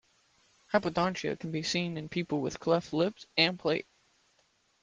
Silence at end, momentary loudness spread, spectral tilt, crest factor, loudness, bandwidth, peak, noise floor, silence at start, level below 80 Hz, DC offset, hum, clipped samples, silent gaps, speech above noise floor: 1 s; 7 LU; -5 dB/octave; 24 dB; -31 LUFS; 9.8 kHz; -10 dBFS; -71 dBFS; 0.7 s; -66 dBFS; under 0.1%; none; under 0.1%; none; 40 dB